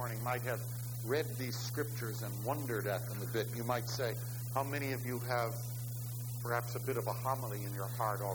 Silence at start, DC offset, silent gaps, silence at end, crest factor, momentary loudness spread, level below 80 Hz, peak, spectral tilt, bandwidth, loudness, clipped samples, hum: 0 s; under 0.1%; none; 0 s; 18 dB; 5 LU; -64 dBFS; -20 dBFS; -5 dB/octave; over 20 kHz; -38 LUFS; under 0.1%; 60 Hz at -40 dBFS